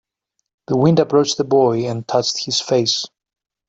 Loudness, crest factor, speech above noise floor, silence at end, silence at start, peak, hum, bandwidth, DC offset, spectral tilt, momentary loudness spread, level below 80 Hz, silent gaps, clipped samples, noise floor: -17 LUFS; 16 dB; 58 dB; 0.6 s; 0.7 s; -2 dBFS; none; 8.2 kHz; under 0.1%; -5 dB/octave; 7 LU; -58 dBFS; none; under 0.1%; -74 dBFS